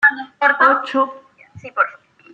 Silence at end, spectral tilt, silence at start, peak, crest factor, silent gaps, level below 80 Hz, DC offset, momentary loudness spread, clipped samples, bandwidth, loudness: 0.4 s; -5 dB/octave; 0 s; -2 dBFS; 16 dB; none; -68 dBFS; under 0.1%; 9 LU; under 0.1%; 8.6 kHz; -17 LUFS